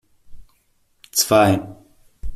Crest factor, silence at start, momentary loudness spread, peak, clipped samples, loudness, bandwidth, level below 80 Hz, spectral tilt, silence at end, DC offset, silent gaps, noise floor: 20 dB; 0.3 s; 24 LU; -2 dBFS; under 0.1%; -17 LUFS; 15 kHz; -40 dBFS; -4 dB/octave; 0 s; under 0.1%; none; -62 dBFS